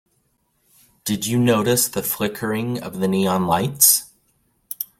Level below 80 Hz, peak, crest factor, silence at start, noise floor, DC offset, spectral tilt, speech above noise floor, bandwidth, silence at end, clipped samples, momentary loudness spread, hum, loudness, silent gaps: -56 dBFS; 0 dBFS; 22 dB; 1.05 s; -67 dBFS; under 0.1%; -3.5 dB/octave; 47 dB; 16.5 kHz; 0.15 s; under 0.1%; 13 LU; none; -19 LUFS; none